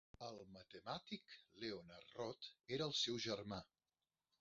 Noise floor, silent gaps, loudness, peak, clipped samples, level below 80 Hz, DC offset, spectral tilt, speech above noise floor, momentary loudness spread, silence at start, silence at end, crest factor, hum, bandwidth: under -90 dBFS; none; -47 LUFS; -30 dBFS; under 0.1%; -78 dBFS; under 0.1%; -3 dB/octave; over 41 dB; 16 LU; 0.2 s; 0.75 s; 20 dB; none; 7.6 kHz